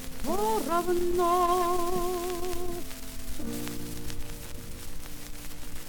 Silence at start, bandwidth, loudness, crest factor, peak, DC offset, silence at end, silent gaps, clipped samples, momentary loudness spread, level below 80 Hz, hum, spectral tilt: 0 s; 19 kHz; -30 LUFS; 16 dB; -14 dBFS; under 0.1%; 0 s; none; under 0.1%; 17 LU; -40 dBFS; none; -4.5 dB/octave